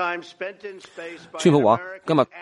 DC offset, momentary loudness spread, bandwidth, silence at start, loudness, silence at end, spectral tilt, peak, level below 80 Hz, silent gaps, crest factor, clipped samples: under 0.1%; 19 LU; 11.5 kHz; 0 s; -21 LUFS; 0 s; -6 dB/octave; -4 dBFS; -68 dBFS; none; 20 dB; under 0.1%